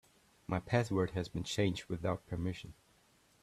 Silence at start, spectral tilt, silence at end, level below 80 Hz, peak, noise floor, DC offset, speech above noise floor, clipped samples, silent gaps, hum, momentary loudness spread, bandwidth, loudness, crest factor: 0.5 s; -6 dB/octave; 0.7 s; -60 dBFS; -16 dBFS; -69 dBFS; under 0.1%; 33 dB; under 0.1%; none; none; 11 LU; 13.5 kHz; -37 LUFS; 22 dB